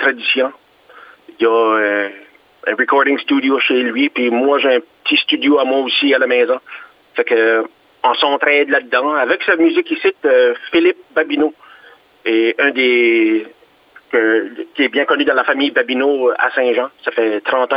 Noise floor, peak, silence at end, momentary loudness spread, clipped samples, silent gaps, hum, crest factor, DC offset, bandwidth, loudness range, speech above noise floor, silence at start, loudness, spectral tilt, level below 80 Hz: -47 dBFS; 0 dBFS; 0 s; 7 LU; under 0.1%; none; none; 16 dB; under 0.1%; 5.2 kHz; 2 LU; 32 dB; 0 s; -15 LUFS; -6 dB/octave; -68 dBFS